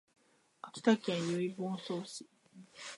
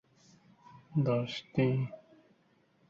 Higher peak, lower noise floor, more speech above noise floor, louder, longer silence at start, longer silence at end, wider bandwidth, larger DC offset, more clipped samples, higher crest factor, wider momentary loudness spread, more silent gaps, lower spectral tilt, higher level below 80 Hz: first, -14 dBFS vs -18 dBFS; second, -56 dBFS vs -69 dBFS; second, 21 dB vs 38 dB; about the same, -35 LUFS vs -33 LUFS; second, 0.65 s vs 0.9 s; second, 0 s vs 0.9 s; first, 11.5 kHz vs 7.4 kHz; neither; neither; first, 24 dB vs 18 dB; first, 18 LU vs 9 LU; neither; second, -5.5 dB/octave vs -8 dB/octave; second, -86 dBFS vs -68 dBFS